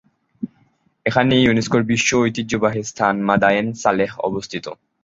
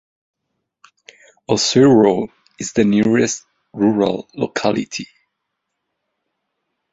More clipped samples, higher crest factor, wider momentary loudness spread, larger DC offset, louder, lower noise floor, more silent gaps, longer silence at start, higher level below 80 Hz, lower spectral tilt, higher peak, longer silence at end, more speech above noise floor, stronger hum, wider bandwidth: neither; about the same, 18 dB vs 18 dB; about the same, 17 LU vs 18 LU; neither; about the same, -18 LUFS vs -16 LUFS; second, -60 dBFS vs -76 dBFS; neither; second, 0.4 s vs 1.5 s; first, -50 dBFS vs -56 dBFS; about the same, -4.5 dB/octave vs -5 dB/octave; about the same, -2 dBFS vs -2 dBFS; second, 0.3 s vs 1.85 s; second, 42 dB vs 61 dB; neither; about the same, 7.8 kHz vs 8 kHz